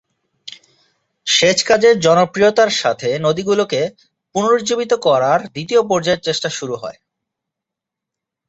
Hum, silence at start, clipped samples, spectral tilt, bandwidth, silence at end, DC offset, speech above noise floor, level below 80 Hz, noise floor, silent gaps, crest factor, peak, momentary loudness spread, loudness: none; 0.45 s; under 0.1%; -3.5 dB/octave; 8.2 kHz; 1.55 s; under 0.1%; 68 dB; -58 dBFS; -83 dBFS; none; 16 dB; -2 dBFS; 13 LU; -15 LUFS